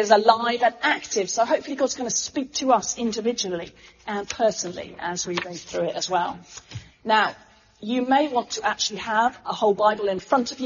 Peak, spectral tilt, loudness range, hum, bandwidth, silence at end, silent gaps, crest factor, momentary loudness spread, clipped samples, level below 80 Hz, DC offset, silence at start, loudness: -2 dBFS; -2 dB/octave; 4 LU; none; 7.4 kHz; 0 s; none; 22 dB; 11 LU; under 0.1%; -60 dBFS; under 0.1%; 0 s; -23 LUFS